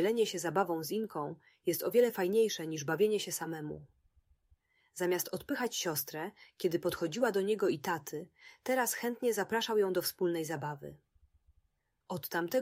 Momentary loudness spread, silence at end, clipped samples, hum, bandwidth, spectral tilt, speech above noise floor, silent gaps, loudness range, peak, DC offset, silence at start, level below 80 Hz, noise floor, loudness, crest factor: 13 LU; 0 s; under 0.1%; none; 16 kHz; -4 dB/octave; 46 dB; none; 4 LU; -16 dBFS; under 0.1%; 0 s; -74 dBFS; -79 dBFS; -34 LUFS; 18 dB